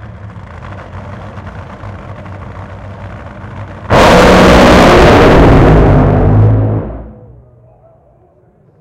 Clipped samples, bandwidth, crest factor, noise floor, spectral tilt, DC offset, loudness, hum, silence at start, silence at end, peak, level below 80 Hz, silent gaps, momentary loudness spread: 0.2%; 16 kHz; 10 dB; -46 dBFS; -6.5 dB/octave; under 0.1%; -6 LUFS; none; 0.05 s; 1.7 s; 0 dBFS; -18 dBFS; none; 24 LU